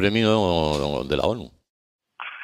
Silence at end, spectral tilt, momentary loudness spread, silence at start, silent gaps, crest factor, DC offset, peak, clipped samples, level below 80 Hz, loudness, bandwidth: 0 s; -6 dB/octave; 17 LU; 0 s; 1.70-1.99 s; 18 dB; under 0.1%; -6 dBFS; under 0.1%; -42 dBFS; -22 LUFS; 14.5 kHz